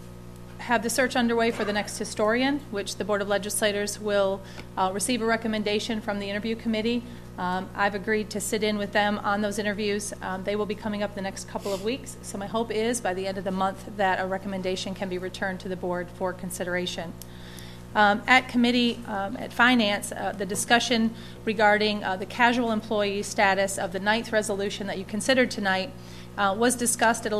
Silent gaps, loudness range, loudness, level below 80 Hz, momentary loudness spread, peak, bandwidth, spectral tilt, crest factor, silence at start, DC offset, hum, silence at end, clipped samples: none; 6 LU; -26 LUFS; -50 dBFS; 11 LU; -4 dBFS; 14.5 kHz; -3.5 dB/octave; 22 dB; 0 s; under 0.1%; 60 Hz at -45 dBFS; 0 s; under 0.1%